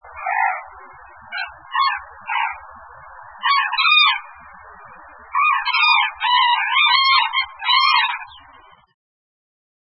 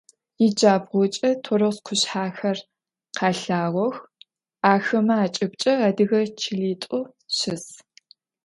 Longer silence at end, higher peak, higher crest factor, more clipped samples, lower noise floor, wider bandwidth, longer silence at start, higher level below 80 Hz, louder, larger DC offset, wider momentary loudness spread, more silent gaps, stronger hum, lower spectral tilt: first, 1.6 s vs 0.7 s; about the same, -2 dBFS vs -2 dBFS; about the same, 20 dB vs 22 dB; neither; second, -48 dBFS vs -56 dBFS; second, 5.8 kHz vs 11.5 kHz; second, 0.05 s vs 0.4 s; first, -60 dBFS vs -70 dBFS; first, -16 LUFS vs -22 LUFS; neither; first, 15 LU vs 9 LU; neither; neither; second, -3 dB/octave vs -4.5 dB/octave